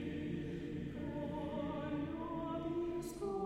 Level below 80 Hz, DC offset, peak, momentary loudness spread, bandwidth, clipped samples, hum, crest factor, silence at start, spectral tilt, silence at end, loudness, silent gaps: -58 dBFS; under 0.1%; -30 dBFS; 3 LU; 15.5 kHz; under 0.1%; none; 12 dB; 0 s; -7 dB/octave; 0 s; -42 LUFS; none